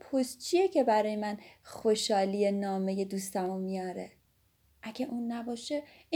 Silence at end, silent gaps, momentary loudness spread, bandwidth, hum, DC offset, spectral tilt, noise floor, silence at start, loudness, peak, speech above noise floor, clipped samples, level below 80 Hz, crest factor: 0 s; none; 15 LU; 20 kHz; none; under 0.1%; -5 dB/octave; -70 dBFS; 0.05 s; -31 LUFS; -16 dBFS; 38 dB; under 0.1%; -72 dBFS; 16 dB